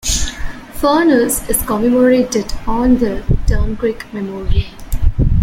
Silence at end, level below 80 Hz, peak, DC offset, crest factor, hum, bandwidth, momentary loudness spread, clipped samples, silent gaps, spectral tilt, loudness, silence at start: 0 s; -20 dBFS; 0 dBFS; under 0.1%; 14 dB; none; 16.5 kHz; 13 LU; under 0.1%; none; -5 dB/octave; -16 LUFS; 0.05 s